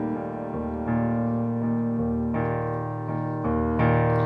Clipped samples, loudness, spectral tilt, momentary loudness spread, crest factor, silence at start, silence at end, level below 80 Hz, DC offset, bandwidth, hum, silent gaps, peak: under 0.1%; -26 LUFS; -11 dB/octave; 8 LU; 14 dB; 0 s; 0 s; -42 dBFS; under 0.1%; 3.9 kHz; none; none; -10 dBFS